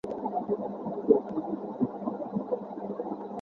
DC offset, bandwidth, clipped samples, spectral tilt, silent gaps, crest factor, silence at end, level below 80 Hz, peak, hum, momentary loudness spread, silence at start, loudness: under 0.1%; 4.3 kHz; under 0.1%; -10.5 dB/octave; none; 22 dB; 0 s; -68 dBFS; -8 dBFS; none; 10 LU; 0.05 s; -32 LUFS